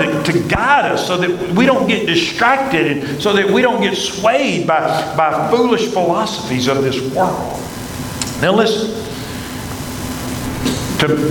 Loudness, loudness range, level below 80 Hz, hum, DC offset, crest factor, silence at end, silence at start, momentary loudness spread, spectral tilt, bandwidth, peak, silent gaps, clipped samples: -16 LUFS; 5 LU; -40 dBFS; none; under 0.1%; 16 dB; 0 s; 0 s; 12 LU; -4.5 dB/octave; 19 kHz; 0 dBFS; none; under 0.1%